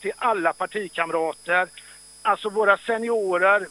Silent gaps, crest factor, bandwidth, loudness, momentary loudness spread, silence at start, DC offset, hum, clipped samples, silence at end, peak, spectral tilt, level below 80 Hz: none; 20 dB; 15.5 kHz; -23 LUFS; 8 LU; 0 s; under 0.1%; none; under 0.1%; 0 s; -4 dBFS; -3.5 dB/octave; -68 dBFS